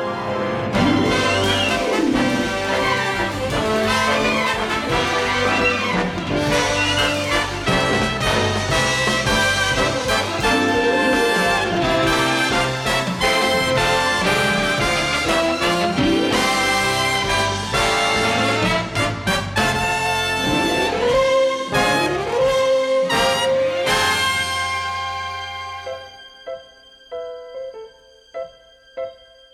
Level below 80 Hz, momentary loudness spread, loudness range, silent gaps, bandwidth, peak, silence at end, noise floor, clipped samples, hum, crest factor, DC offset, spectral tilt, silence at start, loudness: -40 dBFS; 13 LU; 5 LU; none; 16.5 kHz; -4 dBFS; 0.4 s; -48 dBFS; under 0.1%; none; 14 dB; under 0.1%; -3.5 dB/octave; 0 s; -18 LUFS